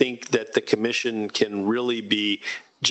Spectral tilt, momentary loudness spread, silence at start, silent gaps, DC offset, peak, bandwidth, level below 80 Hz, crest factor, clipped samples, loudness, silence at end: -3.5 dB/octave; 3 LU; 0 s; none; under 0.1%; -4 dBFS; 8.6 kHz; -68 dBFS; 20 dB; under 0.1%; -24 LUFS; 0 s